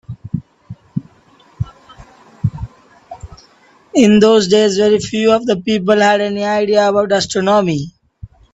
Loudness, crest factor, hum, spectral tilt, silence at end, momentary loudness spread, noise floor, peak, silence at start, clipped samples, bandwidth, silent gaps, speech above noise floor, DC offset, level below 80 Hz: -13 LUFS; 16 dB; none; -5 dB/octave; 0.25 s; 17 LU; -49 dBFS; 0 dBFS; 0.1 s; under 0.1%; 8.4 kHz; none; 37 dB; under 0.1%; -44 dBFS